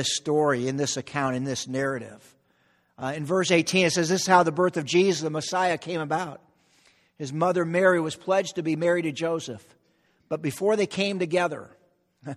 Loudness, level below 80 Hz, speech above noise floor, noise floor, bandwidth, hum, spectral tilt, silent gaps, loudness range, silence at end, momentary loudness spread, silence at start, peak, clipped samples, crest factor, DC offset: -25 LUFS; -68 dBFS; 41 dB; -66 dBFS; 14 kHz; none; -4.5 dB/octave; none; 5 LU; 0 s; 13 LU; 0 s; -4 dBFS; under 0.1%; 20 dB; under 0.1%